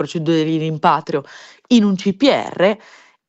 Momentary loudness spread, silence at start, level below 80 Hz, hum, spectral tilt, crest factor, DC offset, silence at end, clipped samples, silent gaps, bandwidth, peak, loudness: 7 LU; 0 s; -62 dBFS; none; -6 dB/octave; 16 dB; under 0.1%; 0.5 s; under 0.1%; none; 8.2 kHz; 0 dBFS; -17 LUFS